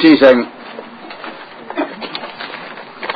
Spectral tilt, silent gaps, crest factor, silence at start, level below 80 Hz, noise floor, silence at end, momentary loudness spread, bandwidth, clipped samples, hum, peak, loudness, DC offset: -7 dB/octave; none; 16 dB; 0 s; -60 dBFS; -32 dBFS; 0 s; 22 LU; 6 kHz; 0.2%; none; 0 dBFS; -16 LUFS; under 0.1%